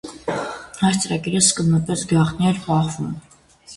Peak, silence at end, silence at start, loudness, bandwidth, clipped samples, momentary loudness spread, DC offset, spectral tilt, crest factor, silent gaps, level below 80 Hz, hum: -2 dBFS; 0 s; 0.05 s; -20 LUFS; 11.5 kHz; under 0.1%; 13 LU; under 0.1%; -4.5 dB/octave; 18 dB; none; -50 dBFS; none